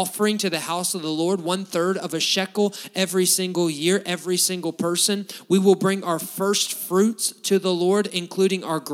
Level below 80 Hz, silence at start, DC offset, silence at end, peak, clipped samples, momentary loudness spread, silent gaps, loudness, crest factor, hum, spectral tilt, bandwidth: -80 dBFS; 0 s; under 0.1%; 0 s; -4 dBFS; under 0.1%; 5 LU; none; -22 LUFS; 18 dB; none; -3.5 dB/octave; 17 kHz